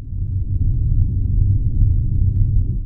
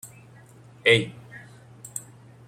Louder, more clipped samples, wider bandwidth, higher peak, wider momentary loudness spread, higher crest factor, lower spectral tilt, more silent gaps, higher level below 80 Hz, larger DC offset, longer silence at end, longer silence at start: about the same, -20 LUFS vs -22 LUFS; neither; second, 0.6 kHz vs 16.5 kHz; about the same, -4 dBFS vs -4 dBFS; second, 4 LU vs 25 LU; second, 12 dB vs 26 dB; first, -14.5 dB/octave vs -3.5 dB/octave; neither; first, -18 dBFS vs -66 dBFS; neither; second, 0 s vs 0.5 s; about the same, 0 s vs 0.05 s